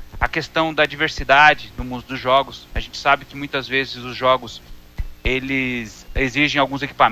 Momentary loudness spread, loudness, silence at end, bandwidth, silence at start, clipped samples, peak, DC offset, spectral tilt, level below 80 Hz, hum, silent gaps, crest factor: 15 LU; -19 LUFS; 0 s; 16 kHz; 0 s; under 0.1%; 0 dBFS; under 0.1%; -4.5 dB/octave; -34 dBFS; none; none; 20 dB